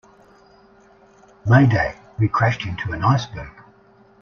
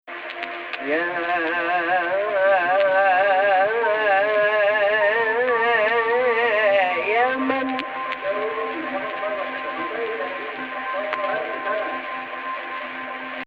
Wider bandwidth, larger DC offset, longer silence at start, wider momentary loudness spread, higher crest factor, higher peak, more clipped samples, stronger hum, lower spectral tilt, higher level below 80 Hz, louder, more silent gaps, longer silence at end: first, 6.8 kHz vs 5.6 kHz; neither; first, 1.45 s vs 0.05 s; first, 17 LU vs 11 LU; about the same, 20 dB vs 16 dB; first, -2 dBFS vs -6 dBFS; neither; neither; first, -7.5 dB/octave vs -5.5 dB/octave; first, -46 dBFS vs -64 dBFS; about the same, -19 LUFS vs -21 LUFS; neither; first, 0.7 s vs 0 s